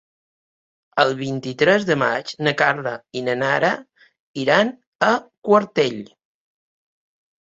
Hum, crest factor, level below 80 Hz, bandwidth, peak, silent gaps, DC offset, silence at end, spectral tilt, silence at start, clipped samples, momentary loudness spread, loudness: none; 20 dB; -64 dBFS; 8 kHz; -2 dBFS; 4.20-4.34 s, 4.87-4.99 s, 5.38-5.42 s; under 0.1%; 1.35 s; -5 dB/octave; 0.95 s; under 0.1%; 10 LU; -20 LUFS